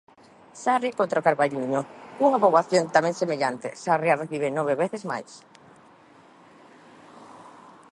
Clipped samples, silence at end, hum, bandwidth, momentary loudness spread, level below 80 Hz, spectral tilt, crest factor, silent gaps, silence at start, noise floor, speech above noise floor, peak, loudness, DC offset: under 0.1%; 0.4 s; none; 11.5 kHz; 12 LU; -76 dBFS; -5 dB/octave; 22 dB; none; 0.55 s; -53 dBFS; 29 dB; -4 dBFS; -24 LUFS; under 0.1%